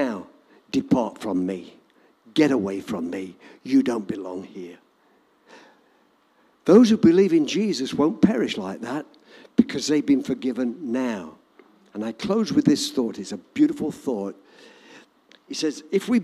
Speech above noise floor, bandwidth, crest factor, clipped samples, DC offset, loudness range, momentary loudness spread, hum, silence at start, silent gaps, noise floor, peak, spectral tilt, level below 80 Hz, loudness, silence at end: 39 dB; 13.5 kHz; 20 dB; under 0.1%; under 0.1%; 8 LU; 17 LU; none; 0 s; none; -61 dBFS; -2 dBFS; -5.5 dB/octave; -64 dBFS; -23 LUFS; 0 s